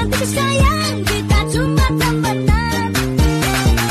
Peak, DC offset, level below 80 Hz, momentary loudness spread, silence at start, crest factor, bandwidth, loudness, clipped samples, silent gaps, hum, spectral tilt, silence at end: -4 dBFS; under 0.1%; -20 dBFS; 3 LU; 0 s; 12 dB; 13.5 kHz; -16 LUFS; under 0.1%; none; none; -5 dB/octave; 0 s